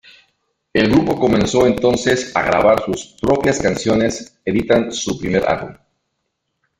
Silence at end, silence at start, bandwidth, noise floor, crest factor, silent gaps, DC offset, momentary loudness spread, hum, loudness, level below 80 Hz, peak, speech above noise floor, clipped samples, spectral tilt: 1.05 s; 0.75 s; 16 kHz; -73 dBFS; 18 dB; none; under 0.1%; 8 LU; none; -17 LUFS; -42 dBFS; 0 dBFS; 57 dB; under 0.1%; -5 dB/octave